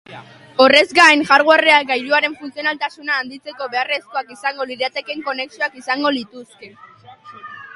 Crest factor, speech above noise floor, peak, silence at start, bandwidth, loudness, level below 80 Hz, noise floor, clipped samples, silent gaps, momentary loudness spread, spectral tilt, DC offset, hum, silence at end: 18 dB; 24 dB; 0 dBFS; 0.1 s; 11.5 kHz; -16 LUFS; -64 dBFS; -41 dBFS; under 0.1%; none; 16 LU; -2 dB/octave; under 0.1%; none; 0 s